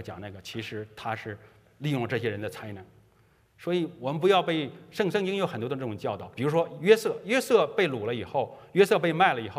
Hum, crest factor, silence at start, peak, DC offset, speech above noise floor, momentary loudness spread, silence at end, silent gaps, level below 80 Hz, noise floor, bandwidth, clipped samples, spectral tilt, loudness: none; 22 dB; 0 s; -6 dBFS; under 0.1%; 35 dB; 15 LU; 0 s; none; -70 dBFS; -63 dBFS; 15.5 kHz; under 0.1%; -5.5 dB/octave; -27 LUFS